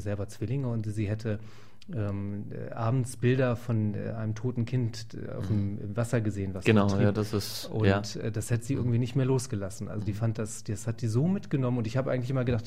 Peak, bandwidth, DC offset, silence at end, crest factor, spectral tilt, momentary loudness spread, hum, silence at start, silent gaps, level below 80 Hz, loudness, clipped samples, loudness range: -10 dBFS; 15.5 kHz; 0.8%; 0 s; 20 dB; -7 dB/octave; 9 LU; none; 0 s; none; -56 dBFS; -30 LUFS; under 0.1%; 3 LU